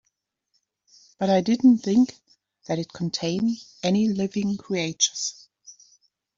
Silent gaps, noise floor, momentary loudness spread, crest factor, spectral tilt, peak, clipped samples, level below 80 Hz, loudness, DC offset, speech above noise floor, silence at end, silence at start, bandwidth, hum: none; -76 dBFS; 11 LU; 20 dB; -4.5 dB/octave; -6 dBFS; under 0.1%; -64 dBFS; -24 LUFS; under 0.1%; 54 dB; 0.65 s; 1.2 s; 7.8 kHz; none